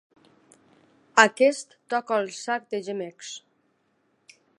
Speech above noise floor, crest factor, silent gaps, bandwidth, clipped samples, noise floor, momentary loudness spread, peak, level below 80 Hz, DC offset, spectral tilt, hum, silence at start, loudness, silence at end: 45 dB; 28 dB; none; 11.5 kHz; under 0.1%; -70 dBFS; 19 LU; 0 dBFS; -82 dBFS; under 0.1%; -2.5 dB/octave; none; 1.15 s; -24 LUFS; 1.2 s